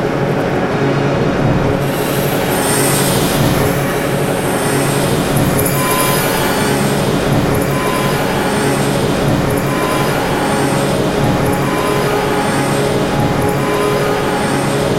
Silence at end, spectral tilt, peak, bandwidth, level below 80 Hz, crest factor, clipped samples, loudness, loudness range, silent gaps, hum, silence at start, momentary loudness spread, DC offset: 0 s; -5 dB/octave; 0 dBFS; 16 kHz; -32 dBFS; 14 dB; under 0.1%; -14 LUFS; 1 LU; none; none; 0 s; 2 LU; under 0.1%